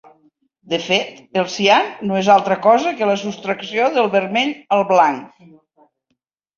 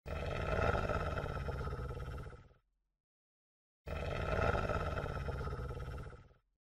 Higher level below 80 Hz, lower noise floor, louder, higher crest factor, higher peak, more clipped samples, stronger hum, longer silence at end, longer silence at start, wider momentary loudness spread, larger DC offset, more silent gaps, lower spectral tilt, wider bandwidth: second, -64 dBFS vs -46 dBFS; about the same, -72 dBFS vs -72 dBFS; first, -17 LUFS vs -39 LUFS; about the same, 18 dB vs 18 dB; first, 0 dBFS vs -22 dBFS; neither; neither; first, 1.3 s vs 0.35 s; first, 0.65 s vs 0.05 s; second, 10 LU vs 15 LU; neither; second, none vs 3.00-3.85 s; second, -4.5 dB/octave vs -7 dB/octave; second, 7.4 kHz vs 13 kHz